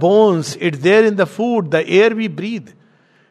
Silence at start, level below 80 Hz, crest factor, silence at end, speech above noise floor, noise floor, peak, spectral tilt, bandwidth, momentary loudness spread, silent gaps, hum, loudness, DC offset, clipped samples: 0 s; -66 dBFS; 16 dB; 0.65 s; 39 dB; -53 dBFS; 0 dBFS; -6 dB/octave; 12 kHz; 11 LU; none; none; -15 LUFS; under 0.1%; under 0.1%